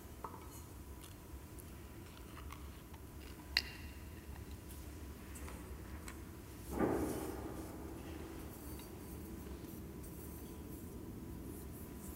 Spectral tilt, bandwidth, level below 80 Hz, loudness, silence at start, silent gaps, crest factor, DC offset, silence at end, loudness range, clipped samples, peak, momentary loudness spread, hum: -4.5 dB/octave; 16 kHz; -54 dBFS; -47 LUFS; 0 s; none; 32 dB; under 0.1%; 0 s; 6 LU; under 0.1%; -14 dBFS; 15 LU; none